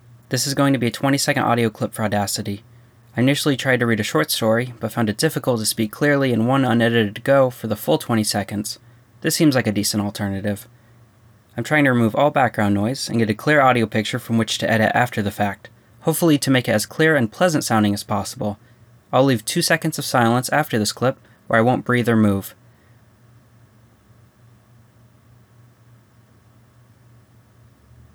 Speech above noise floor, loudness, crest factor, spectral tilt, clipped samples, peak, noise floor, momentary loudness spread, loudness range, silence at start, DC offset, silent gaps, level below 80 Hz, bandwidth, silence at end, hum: 34 dB; -19 LUFS; 16 dB; -5 dB/octave; under 0.1%; -4 dBFS; -52 dBFS; 9 LU; 3 LU; 0.3 s; under 0.1%; none; -60 dBFS; over 20 kHz; 5.6 s; none